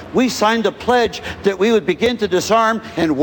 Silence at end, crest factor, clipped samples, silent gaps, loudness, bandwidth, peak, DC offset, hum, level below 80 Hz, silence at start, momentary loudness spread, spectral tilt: 0 s; 14 dB; under 0.1%; none; -17 LUFS; 18 kHz; -2 dBFS; under 0.1%; none; -46 dBFS; 0 s; 5 LU; -4.5 dB/octave